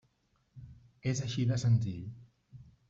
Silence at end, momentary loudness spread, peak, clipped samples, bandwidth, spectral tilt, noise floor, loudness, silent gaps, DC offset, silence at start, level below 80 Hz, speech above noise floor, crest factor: 0.25 s; 24 LU; -18 dBFS; under 0.1%; 7.8 kHz; -6 dB/octave; -74 dBFS; -33 LUFS; none; under 0.1%; 0.55 s; -62 dBFS; 43 dB; 18 dB